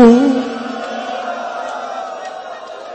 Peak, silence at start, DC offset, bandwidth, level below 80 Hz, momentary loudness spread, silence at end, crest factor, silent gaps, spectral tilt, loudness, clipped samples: 0 dBFS; 0 s; under 0.1%; 8.6 kHz; -50 dBFS; 16 LU; 0 s; 16 dB; none; -5.5 dB/octave; -19 LUFS; under 0.1%